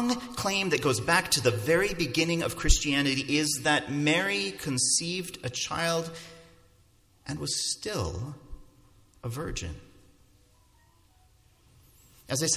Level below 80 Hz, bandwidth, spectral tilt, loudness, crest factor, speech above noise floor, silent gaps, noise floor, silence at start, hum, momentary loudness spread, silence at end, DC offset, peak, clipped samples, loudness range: -42 dBFS; 16 kHz; -3 dB/octave; -27 LUFS; 22 dB; 34 dB; none; -62 dBFS; 0 s; none; 15 LU; 0 s; under 0.1%; -8 dBFS; under 0.1%; 17 LU